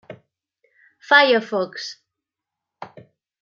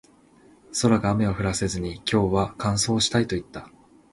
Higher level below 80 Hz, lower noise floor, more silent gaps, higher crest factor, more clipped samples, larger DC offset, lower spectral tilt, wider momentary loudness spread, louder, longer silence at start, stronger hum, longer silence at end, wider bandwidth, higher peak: second, -80 dBFS vs -44 dBFS; first, -85 dBFS vs -55 dBFS; neither; about the same, 22 dB vs 20 dB; neither; neither; about the same, -3.5 dB/octave vs -4.5 dB/octave; first, 27 LU vs 10 LU; first, -17 LUFS vs -24 LUFS; second, 0.1 s vs 0.7 s; neither; about the same, 0.55 s vs 0.45 s; second, 7.6 kHz vs 11.5 kHz; first, -2 dBFS vs -6 dBFS